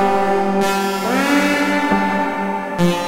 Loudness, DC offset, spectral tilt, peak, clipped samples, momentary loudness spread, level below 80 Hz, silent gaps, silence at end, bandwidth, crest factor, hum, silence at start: -17 LUFS; under 0.1%; -5 dB/octave; -4 dBFS; under 0.1%; 5 LU; -48 dBFS; none; 0 s; 16.5 kHz; 14 dB; none; 0 s